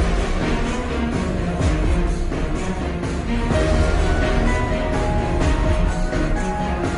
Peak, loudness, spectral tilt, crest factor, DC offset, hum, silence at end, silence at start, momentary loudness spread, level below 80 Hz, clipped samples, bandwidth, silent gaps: -6 dBFS; -22 LUFS; -6.5 dB/octave; 14 dB; under 0.1%; none; 0 s; 0 s; 5 LU; -22 dBFS; under 0.1%; 10.5 kHz; none